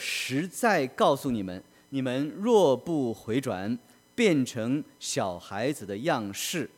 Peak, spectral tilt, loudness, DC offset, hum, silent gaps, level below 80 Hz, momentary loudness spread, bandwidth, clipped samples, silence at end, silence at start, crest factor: -8 dBFS; -4.5 dB/octave; -28 LUFS; under 0.1%; none; none; -66 dBFS; 9 LU; 18 kHz; under 0.1%; 0.1 s; 0 s; 18 dB